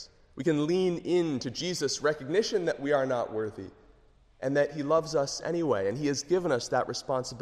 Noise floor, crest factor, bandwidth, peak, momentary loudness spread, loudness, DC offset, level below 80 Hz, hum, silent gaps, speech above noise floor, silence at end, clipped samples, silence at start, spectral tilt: -60 dBFS; 16 dB; 13 kHz; -14 dBFS; 6 LU; -29 LUFS; under 0.1%; -62 dBFS; none; none; 31 dB; 0 s; under 0.1%; 0 s; -4.5 dB/octave